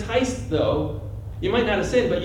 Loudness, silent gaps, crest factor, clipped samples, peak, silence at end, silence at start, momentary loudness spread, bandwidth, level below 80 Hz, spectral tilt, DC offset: -23 LUFS; none; 14 dB; under 0.1%; -8 dBFS; 0 s; 0 s; 10 LU; 12.5 kHz; -38 dBFS; -5.5 dB/octave; under 0.1%